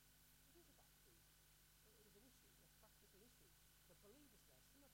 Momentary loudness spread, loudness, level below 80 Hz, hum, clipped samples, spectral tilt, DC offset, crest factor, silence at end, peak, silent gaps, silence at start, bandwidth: 1 LU; -69 LUFS; -80 dBFS; 50 Hz at -80 dBFS; under 0.1%; -3 dB/octave; under 0.1%; 14 dB; 0 s; -58 dBFS; none; 0 s; 16 kHz